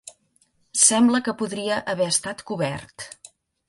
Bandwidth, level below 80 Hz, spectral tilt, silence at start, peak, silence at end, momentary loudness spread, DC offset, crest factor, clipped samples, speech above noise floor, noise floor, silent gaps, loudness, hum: 11.5 kHz; -62 dBFS; -2.5 dB/octave; 0.05 s; -2 dBFS; 0.6 s; 20 LU; under 0.1%; 22 dB; under 0.1%; 41 dB; -65 dBFS; none; -21 LUFS; none